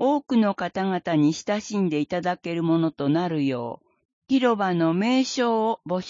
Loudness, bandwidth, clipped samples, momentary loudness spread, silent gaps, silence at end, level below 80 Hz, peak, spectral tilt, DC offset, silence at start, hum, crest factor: -24 LUFS; 7.6 kHz; under 0.1%; 5 LU; 4.05-4.22 s; 0 s; -66 dBFS; -8 dBFS; -6 dB/octave; under 0.1%; 0 s; none; 14 dB